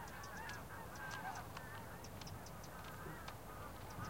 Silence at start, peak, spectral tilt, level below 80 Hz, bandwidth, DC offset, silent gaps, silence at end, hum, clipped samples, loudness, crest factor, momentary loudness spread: 0 s; -28 dBFS; -4 dB/octave; -62 dBFS; 17 kHz; under 0.1%; none; 0 s; none; under 0.1%; -50 LUFS; 22 dB; 5 LU